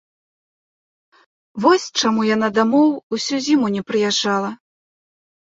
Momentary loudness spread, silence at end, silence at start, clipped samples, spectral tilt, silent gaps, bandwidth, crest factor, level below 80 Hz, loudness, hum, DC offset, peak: 7 LU; 1.05 s; 1.55 s; under 0.1%; -4 dB/octave; 3.03-3.10 s; 8 kHz; 18 dB; -64 dBFS; -18 LUFS; none; under 0.1%; -2 dBFS